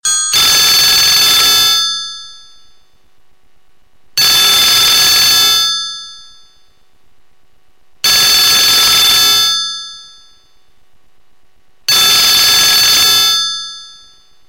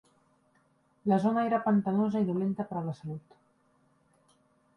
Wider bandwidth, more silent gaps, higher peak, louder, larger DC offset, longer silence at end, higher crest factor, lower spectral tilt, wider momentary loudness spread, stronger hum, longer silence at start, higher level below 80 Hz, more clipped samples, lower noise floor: first, 17 kHz vs 6.2 kHz; neither; first, 0 dBFS vs -14 dBFS; first, -7 LUFS vs -29 LUFS; first, 0.6% vs under 0.1%; second, 0.6 s vs 1.6 s; second, 12 dB vs 18 dB; second, 1.5 dB/octave vs -9.5 dB/octave; about the same, 14 LU vs 13 LU; neither; second, 0.05 s vs 1.05 s; first, -46 dBFS vs -74 dBFS; neither; second, -56 dBFS vs -69 dBFS